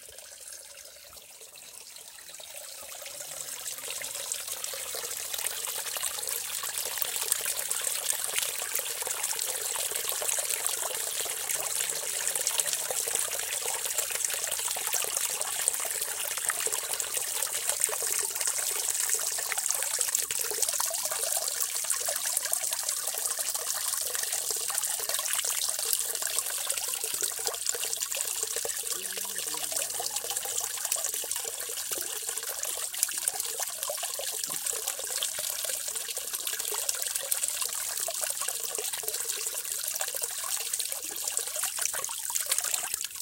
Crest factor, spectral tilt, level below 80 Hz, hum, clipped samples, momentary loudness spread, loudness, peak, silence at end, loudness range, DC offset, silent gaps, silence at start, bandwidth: 30 dB; 2.5 dB/octave; -70 dBFS; none; under 0.1%; 6 LU; -29 LUFS; -2 dBFS; 0 s; 4 LU; under 0.1%; none; 0 s; 17 kHz